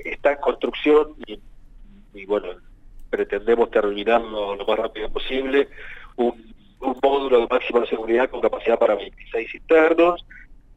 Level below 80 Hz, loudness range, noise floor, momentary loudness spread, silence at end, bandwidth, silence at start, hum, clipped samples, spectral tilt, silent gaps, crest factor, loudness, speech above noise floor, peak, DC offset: -42 dBFS; 4 LU; -44 dBFS; 12 LU; 0.25 s; 8 kHz; 0 s; none; under 0.1%; -6 dB/octave; none; 16 dB; -21 LUFS; 23 dB; -6 dBFS; under 0.1%